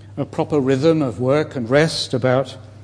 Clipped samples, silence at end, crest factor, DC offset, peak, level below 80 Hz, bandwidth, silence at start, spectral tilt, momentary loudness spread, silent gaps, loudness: under 0.1%; 0 s; 16 dB; under 0.1%; -4 dBFS; -54 dBFS; 10.5 kHz; 0 s; -6 dB/octave; 7 LU; none; -19 LUFS